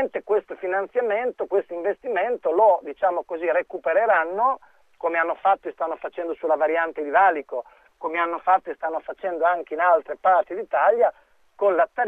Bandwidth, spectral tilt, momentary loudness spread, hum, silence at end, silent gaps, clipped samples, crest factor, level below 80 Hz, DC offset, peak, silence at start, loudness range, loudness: 3.8 kHz; -6 dB/octave; 10 LU; none; 0 s; none; under 0.1%; 16 dB; -68 dBFS; under 0.1%; -6 dBFS; 0 s; 2 LU; -23 LUFS